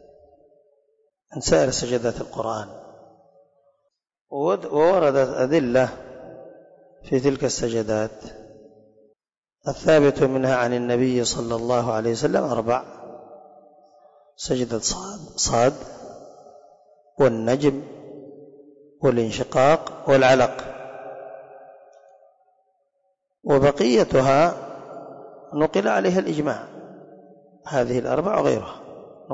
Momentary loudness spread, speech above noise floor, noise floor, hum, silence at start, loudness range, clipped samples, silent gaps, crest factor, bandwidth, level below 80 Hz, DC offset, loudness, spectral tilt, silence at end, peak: 23 LU; 59 dB; -79 dBFS; none; 1.3 s; 5 LU; under 0.1%; 4.21-4.25 s, 9.38-9.42 s; 16 dB; 8 kHz; -50 dBFS; under 0.1%; -21 LUFS; -5 dB/octave; 0 s; -8 dBFS